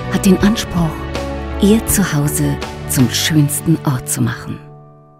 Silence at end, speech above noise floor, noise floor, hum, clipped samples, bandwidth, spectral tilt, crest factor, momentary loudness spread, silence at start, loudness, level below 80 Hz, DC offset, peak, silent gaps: 0.35 s; 25 dB; -40 dBFS; none; under 0.1%; 16.5 kHz; -5 dB/octave; 16 dB; 11 LU; 0 s; -15 LUFS; -30 dBFS; under 0.1%; 0 dBFS; none